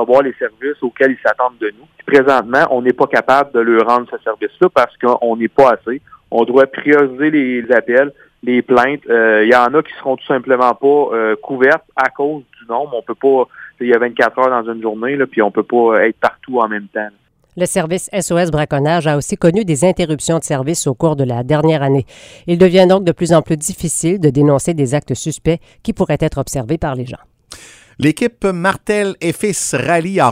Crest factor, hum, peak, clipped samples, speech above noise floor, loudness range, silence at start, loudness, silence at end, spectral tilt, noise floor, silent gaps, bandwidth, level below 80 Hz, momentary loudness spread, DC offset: 14 dB; none; 0 dBFS; under 0.1%; 25 dB; 4 LU; 0 s; -14 LUFS; 0 s; -5.5 dB/octave; -38 dBFS; none; 16 kHz; -44 dBFS; 9 LU; under 0.1%